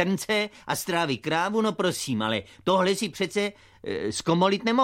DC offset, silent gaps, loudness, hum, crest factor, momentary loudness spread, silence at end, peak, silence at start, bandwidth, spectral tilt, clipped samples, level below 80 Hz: under 0.1%; none; -26 LUFS; none; 18 dB; 7 LU; 0 s; -8 dBFS; 0 s; 16 kHz; -4.5 dB/octave; under 0.1%; -62 dBFS